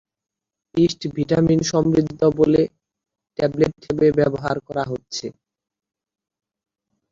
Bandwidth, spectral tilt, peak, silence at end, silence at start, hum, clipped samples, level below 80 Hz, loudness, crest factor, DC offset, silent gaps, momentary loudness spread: 7.6 kHz; -6.5 dB/octave; -4 dBFS; 1.8 s; 0.75 s; none; under 0.1%; -50 dBFS; -20 LUFS; 18 dB; under 0.1%; none; 10 LU